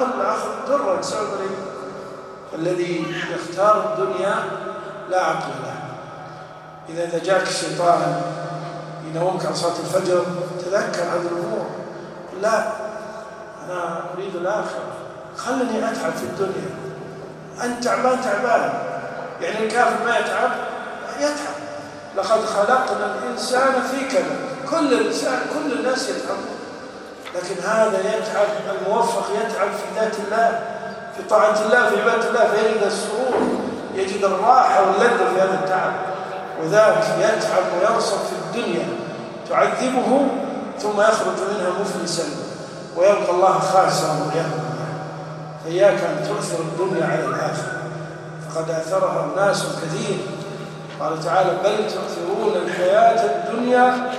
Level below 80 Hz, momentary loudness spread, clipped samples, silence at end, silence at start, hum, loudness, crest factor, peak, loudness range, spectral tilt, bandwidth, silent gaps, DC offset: -64 dBFS; 15 LU; under 0.1%; 0 s; 0 s; none; -21 LUFS; 18 dB; -2 dBFS; 7 LU; -4.5 dB/octave; 14.5 kHz; none; under 0.1%